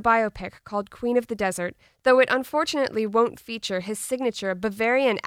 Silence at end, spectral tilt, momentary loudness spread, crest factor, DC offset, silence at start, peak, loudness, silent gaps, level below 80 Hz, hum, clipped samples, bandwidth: 0 s; -4 dB/octave; 12 LU; 18 dB; under 0.1%; 0 s; -6 dBFS; -24 LUFS; none; -56 dBFS; none; under 0.1%; 16 kHz